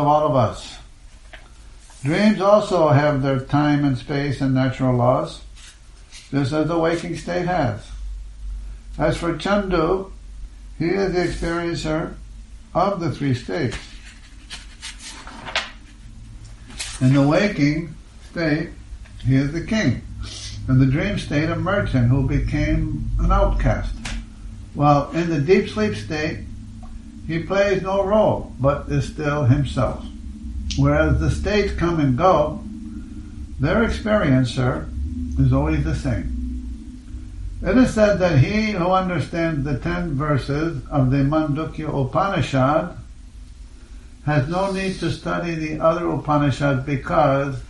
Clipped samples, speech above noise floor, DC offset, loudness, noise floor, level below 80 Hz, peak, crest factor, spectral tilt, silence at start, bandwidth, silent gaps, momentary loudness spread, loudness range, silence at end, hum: under 0.1%; 24 dB; under 0.1%; -20 LUFS; -43 dBFS; -32 dBFS; -2 dBFS; 20 dB; -7 dB/octave; 0 s; 11.5 kHz; none; 19 LU; 5 LU; 0 s; none